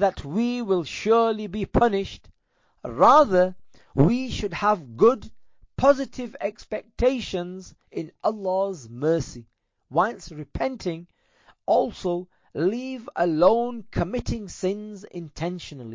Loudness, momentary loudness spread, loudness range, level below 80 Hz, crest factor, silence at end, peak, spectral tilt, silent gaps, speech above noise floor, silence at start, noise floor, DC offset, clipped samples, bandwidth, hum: -24 LUFS; 16 LU; 6 LU; -44 dBFS; 18 dB; 0 s; -6 dBFS; -6.5 dB/octave; none; 43 dB; 0 s; -67 dBFS; under 0.1%; under 0.1%; 7.6 kHz; none